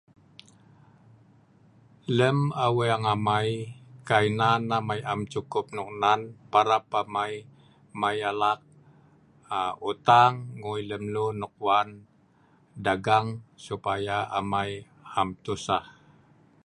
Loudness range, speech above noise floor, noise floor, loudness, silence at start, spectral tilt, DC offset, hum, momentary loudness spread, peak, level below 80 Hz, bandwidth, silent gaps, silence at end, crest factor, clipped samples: 4 LU; 35 dB; -61 dBFS; -26 LUFS; 2.1 s; -5.5 dB/octave; under 0.1%; none; 12 LU; -4 dBFS; -60 dBFS; 11.5 kHz; none; 0.75 s; 24 dB; under 0.1%